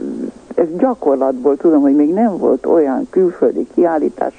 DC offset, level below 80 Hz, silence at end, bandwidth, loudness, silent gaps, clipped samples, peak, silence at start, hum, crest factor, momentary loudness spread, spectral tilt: under 0.1%; -54 dBFS; 0.1 s; 9 kHz; -14 LUFS; none; under 0.1%; -2 dBFS; 0 s; none; 12 dB; 6 LU; -9 dB/octave